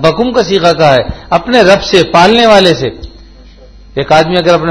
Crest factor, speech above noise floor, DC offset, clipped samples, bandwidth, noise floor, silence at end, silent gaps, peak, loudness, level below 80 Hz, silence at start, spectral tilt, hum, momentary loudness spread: 8 dB; 27 dB; under 0.1%; 3%; 11 kHz; -35 dBFS; 0 s; none; 0 dBFS; -8 LUFS; -32 dBFS; 0 s; -5 dB/octave; none; 9 LU